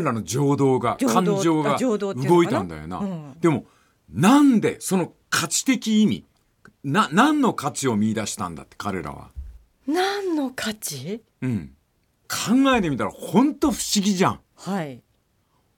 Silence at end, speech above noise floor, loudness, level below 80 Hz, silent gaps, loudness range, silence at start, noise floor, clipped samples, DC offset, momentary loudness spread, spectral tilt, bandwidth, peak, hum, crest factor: 0.8 s; 45 dB; -22 LUFS; -52 dBFS; none; 7 LU; 0 s; -66 dBFS; under 0.1%; under 0.1%; 14 LU; -5 dB/octave; 17.5 kHz; -4 dBFS; none; 18 dB